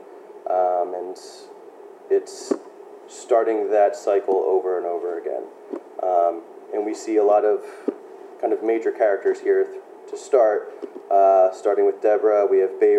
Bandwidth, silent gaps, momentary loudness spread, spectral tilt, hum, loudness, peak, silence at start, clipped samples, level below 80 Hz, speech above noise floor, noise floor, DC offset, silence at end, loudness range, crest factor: 9.8 kHz; none; 18 LU; -4 dB/octave; none; -21 LUFS; -4 dBFS; 0.1 s; under 0.1%; under -90 dBFS; 23 dB; -43 dBFS; under 0.1%; 0 s; 4 LU; 18 dB